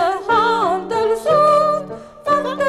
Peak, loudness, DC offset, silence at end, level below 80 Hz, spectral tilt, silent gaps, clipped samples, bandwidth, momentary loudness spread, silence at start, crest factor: -4 dBFS; -16 LUFS; under 0.1%; 0 s; -52 dBFS; -5 dB/octave; none; under 0.1%; 13.5 kHz; 10 LU; 0 s; 12 dB